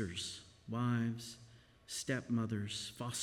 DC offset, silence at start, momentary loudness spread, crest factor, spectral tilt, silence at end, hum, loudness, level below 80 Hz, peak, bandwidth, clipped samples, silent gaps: under 0.1%; 0 s; 12 LU; 16 dB; -4.5 dB/octave; 0 s; none; -40 LUFS; -70 dBFS; -24 dBFS; 16 kHz; under 0.1%; none